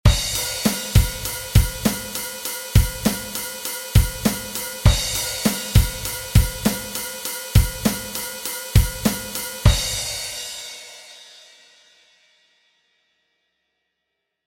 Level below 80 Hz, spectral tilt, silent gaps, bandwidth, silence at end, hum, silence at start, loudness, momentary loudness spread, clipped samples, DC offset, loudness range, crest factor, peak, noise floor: -26 dBFS; -4 dB/octave; none; 17 kHz; 3.15 s; none; 0.05 s; -22 LUFS; 9 LU; under 0.1%; under 0.1%; 5 LU; 20 dB; 0 dBFS; -78 dBFS